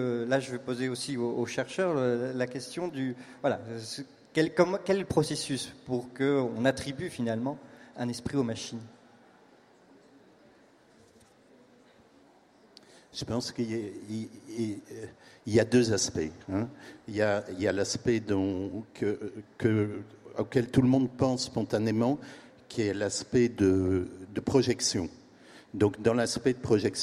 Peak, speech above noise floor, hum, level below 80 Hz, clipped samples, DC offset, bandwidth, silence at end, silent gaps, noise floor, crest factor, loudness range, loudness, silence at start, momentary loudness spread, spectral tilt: -8 dBFS; 31 dB; none; -60 dBFS; under 0.1%; under 0.1%; 14 kHz; 0 s; none; -60 dBFS; 22 dB; 10 LU; -30 LUFS; 0 s; 13 LU; -5 dB/octave